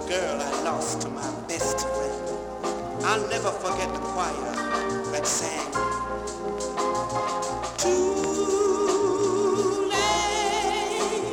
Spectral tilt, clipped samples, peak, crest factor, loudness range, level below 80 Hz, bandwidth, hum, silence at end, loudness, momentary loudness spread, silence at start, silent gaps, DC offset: -3 dB/octave; under 0.1%; -8 dBFS; 18 dB; 4 LU; -48 dBFS; 17.5 kHz; none; 0 s; -26 LUFS; 8 LU; 0 s; none; under 0.1%